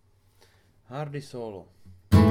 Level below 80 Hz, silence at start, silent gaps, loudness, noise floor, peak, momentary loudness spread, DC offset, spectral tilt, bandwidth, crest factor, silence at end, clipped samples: -44 dBFS; 0.9 s; none; -28 LUFS; -60 dBFS; -6 dBFS; 19 LU; under 0.1%; -8 dB/octave; 16 kHz; 20 dB; 0 s; under 0.1%